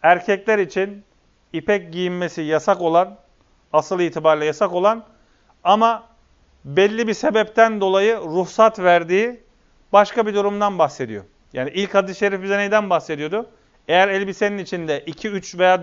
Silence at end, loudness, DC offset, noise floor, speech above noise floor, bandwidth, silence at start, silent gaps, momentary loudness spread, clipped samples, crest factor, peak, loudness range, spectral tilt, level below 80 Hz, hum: 0 s; -19 LUFS; under 0.1%; -56 dBFS; 38 dB; 7.6 kHz; 0 s; none; 11 LU; under 0.1%; 20 dB; 0 dBFS; 4 LU; -5 dB/octave; -58 dBFS; none